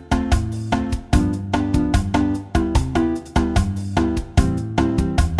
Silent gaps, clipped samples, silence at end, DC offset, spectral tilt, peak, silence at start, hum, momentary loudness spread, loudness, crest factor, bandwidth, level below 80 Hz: none; under 0.1%; 0 s; under 0.1%; -6.5 dB/octave; -4 dBFS; 0 s; none; 3 LU; -21 LUFS; 16 dB; 12.5 kHz; -24 dBFS